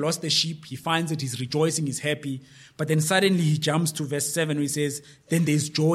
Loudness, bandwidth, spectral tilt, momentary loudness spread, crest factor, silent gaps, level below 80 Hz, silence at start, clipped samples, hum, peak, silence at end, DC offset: -25 LUFS; 15 kHz; -4.5 dB/octave; 9 LU; 18 dB; none; -68 dBFS; 0 s; under 0.1%; none; -8 dBFS; 0 s; under 0.1%